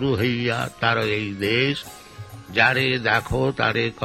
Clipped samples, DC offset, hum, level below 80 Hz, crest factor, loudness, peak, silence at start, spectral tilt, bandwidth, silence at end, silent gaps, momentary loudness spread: under 0.1%; under 0.1%; none; -46 dBFS; 20 dB; -21 LUFS; -4 dBFS; 0 s; -5.5 dB/octave; 16 kHz; 0 s; none; 16 LU